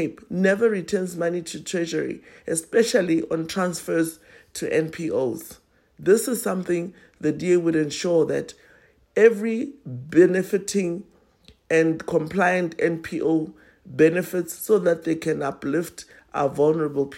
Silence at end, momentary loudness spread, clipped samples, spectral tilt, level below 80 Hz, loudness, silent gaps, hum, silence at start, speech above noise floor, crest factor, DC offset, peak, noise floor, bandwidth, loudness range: 0 s; 12 LU; under 0.1%; -5.5 dB/octave; -62 dBFS; -23 LUFS; none; none; 0 s; 34 dB; 18 dB; under 0.1%; -4 dBFS; -56 dBFS; 16 kHz; 3 LU